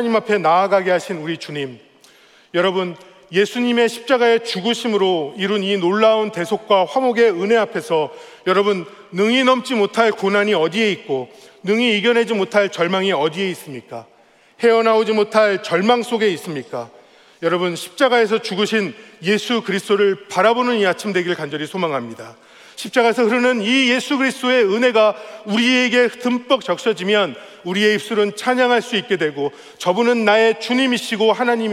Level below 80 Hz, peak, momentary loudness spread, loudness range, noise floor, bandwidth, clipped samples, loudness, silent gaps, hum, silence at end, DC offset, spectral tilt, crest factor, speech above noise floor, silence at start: -74 dBFS; -2 dBFS; 11 LU; 3 LU; -49 dBFS; 14.5 kHz; under 0.1%; -17 LUFS; none; none; 0 s; under 0.1%; -4.5 dB/octave; 16 dB; 32 dB; 0 s